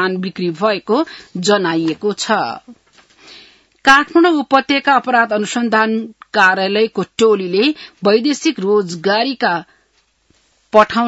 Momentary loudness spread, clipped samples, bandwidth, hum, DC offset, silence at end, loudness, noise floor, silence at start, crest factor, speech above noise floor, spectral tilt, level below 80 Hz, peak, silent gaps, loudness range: 8 LU; under 0.1%; 8.8 kHz; none; under 0.1%; 0 s; -15 LUFS; -60 dBFS; 0 s; 16 dB; 45 dB; -4 dB/octave; -56 dBFS; 0 dBFS; none; 5 LU